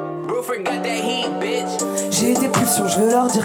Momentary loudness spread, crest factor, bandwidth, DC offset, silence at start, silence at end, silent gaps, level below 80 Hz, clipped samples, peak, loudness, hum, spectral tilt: 7 LU; 14 dB; over 20 kHz; under 0.1%; 0 s; 0 s; none; -60 dBFS; under 0.1%; -4 dBFS; -19 LUFS; none; -3.5 dB/octave